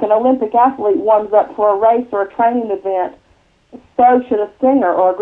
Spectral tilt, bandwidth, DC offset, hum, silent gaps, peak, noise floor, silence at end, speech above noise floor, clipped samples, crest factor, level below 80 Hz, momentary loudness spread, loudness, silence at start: -8.5 dB/octave; 4 kHz; under 0.1%; none; none; 0 dBFS; -52 dBFS; 0 s; 38 dB; under 0.1%; 14 dB; -56 dBFS; 8 LU; -14 LUFS; 0 s